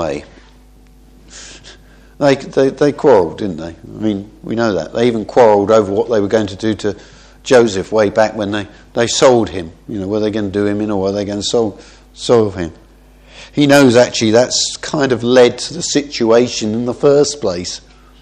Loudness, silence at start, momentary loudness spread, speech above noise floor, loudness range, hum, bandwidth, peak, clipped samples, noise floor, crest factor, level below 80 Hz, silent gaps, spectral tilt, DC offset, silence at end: -14 LUFS; 0 s; 14 LU; 30 dB; 5 LU; none; 13.5 kHz; 0 dBFS; 0.1%; -43 dBFS; 14 dB; -44 dBFS; none; -4.5 dB/octave; under 0.1%; 0.45 s